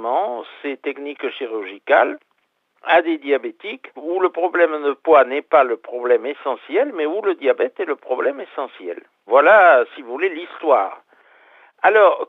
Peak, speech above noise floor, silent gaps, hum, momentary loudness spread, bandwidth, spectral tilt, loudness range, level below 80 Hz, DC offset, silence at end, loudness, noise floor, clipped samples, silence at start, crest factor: -2 dBFS; 49 dB; none; none; 16 LU; 4.1 kHz; -5 dB/octave; 4 LU; -76 dBFS; under 0.1%; 0.05 s; -18 LUFS; -67 dBFS; under 0.1%; 0 s; 16 dB